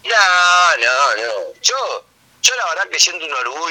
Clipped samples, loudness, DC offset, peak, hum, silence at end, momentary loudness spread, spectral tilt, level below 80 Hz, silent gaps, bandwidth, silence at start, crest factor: under 0.1%; -14 LUFS; under 0.1%; 0 dBFS; none; 0 s; 11 LU; 2.5 dB/octave; -68 dBFS; none; 19 kHz; 0.05 s; 16 dB